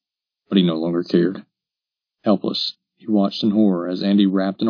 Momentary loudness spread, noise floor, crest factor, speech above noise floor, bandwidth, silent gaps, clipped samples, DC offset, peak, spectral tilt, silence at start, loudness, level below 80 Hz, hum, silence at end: 8 LU; -88 dBFS; 18 dB; 69 dB; 5.4 kHz; none; under 0.1%; under 0.1%; -2 dBFS; -8 dB/octave; 0.5 s; -20 LUFS; -70 dBFS; none; 0 s